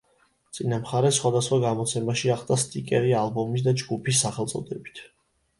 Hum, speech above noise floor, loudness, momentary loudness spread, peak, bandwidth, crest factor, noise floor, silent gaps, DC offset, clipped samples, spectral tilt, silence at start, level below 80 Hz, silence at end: none; 41 dB; -25 LUFS; 12 LU; -8 dBFS; 11.5 kHz; 16 dB; -65 dBFS; none; under 0.1%; under 0.1%; -4.5 dB/octave; 0.55 s; -62 dBFS; 0.55 s